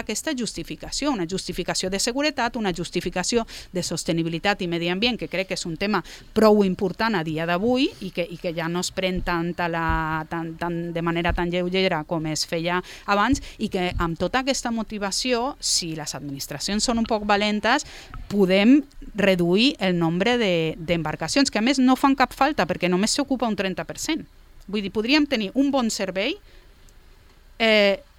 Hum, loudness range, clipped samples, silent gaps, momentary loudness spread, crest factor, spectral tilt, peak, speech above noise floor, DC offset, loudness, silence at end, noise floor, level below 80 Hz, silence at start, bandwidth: none; 4 LU; under 0.1%; none; 9 LU; 20 dB; -4 dB/octave; -4 dBFS; 27 dB; under 0.1%; -23 LUFS; 0.15 s; -50 dBFS; -42 dBFS; 0 s; 16.5 kHz